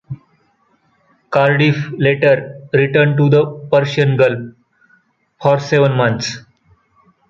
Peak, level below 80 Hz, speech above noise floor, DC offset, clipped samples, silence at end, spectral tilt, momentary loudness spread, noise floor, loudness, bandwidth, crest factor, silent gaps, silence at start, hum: -2 dBFS; -54 dBFS; 45 dB; under 0.1%; under 0.1%; 0.9 s; -6.5 dB/octave; 12 LU; -59 dBFS; -14 LUFS; 7.4 kHz; 14 dB; none; 0.1 s; none